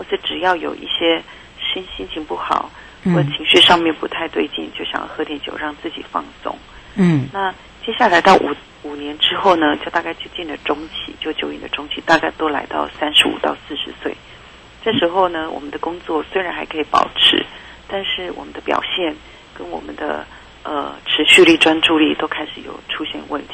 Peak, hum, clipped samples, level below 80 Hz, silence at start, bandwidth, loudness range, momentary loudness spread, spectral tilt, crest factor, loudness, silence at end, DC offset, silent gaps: 0 dBFS; none; under 0.1%; -48 dBFS; 0 s; 12.5 kHz; 7 LU; 17 LU; -4 dB/octave; 18 dB; -17 LUFS; 0 s; under 0.1%; none